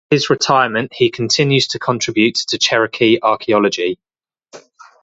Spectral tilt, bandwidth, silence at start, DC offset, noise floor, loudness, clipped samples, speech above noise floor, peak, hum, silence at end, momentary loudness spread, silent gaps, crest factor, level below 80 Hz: -4 dB/octave; 8 kHz; 0.1 s; under 0.1%; -54 dBFS; -15 LUFS; under 0.1%; 39 dB; 0 dBFS; none; 0.45 s; 5 LU; none; 16 dB; -58 dBFS